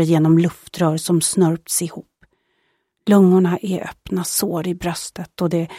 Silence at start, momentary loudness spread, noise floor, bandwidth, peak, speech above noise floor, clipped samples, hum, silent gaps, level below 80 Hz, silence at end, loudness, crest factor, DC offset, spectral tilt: 0 s; 13 LU; -68 dBFS; 16 kHz; -2 dBFS; 50 dB; under 0.1%; none; none; -52 dBFS; 0 s; -18 LUFS; 16 dB; under 0.1%; -5.5 dB/octave